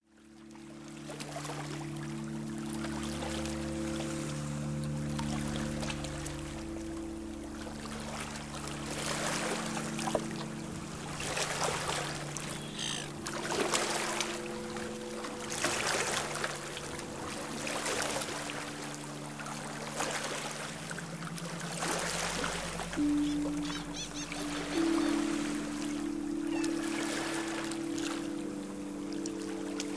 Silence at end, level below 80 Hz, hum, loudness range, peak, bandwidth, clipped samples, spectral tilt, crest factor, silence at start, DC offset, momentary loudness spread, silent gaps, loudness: 0 s; -54 dBFS; none; 5 LU; -12 dBFS; 11 kHz; under 0.1%; -3.5 dB/octave; 24 dB; 0 s; under 0.1%; 9 LU; none; -36 LUFS